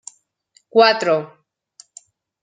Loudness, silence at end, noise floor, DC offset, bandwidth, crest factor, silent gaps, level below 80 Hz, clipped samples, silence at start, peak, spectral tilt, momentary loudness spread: -16 LUFS; 1.15 s; -60 dBFS; under 0.1%; 9.4 kHz; 20 dB; none; -72 dBFS; under 0.1%; 0.75 s; -2 dBFS; -3.5 dB/octave; 25 LU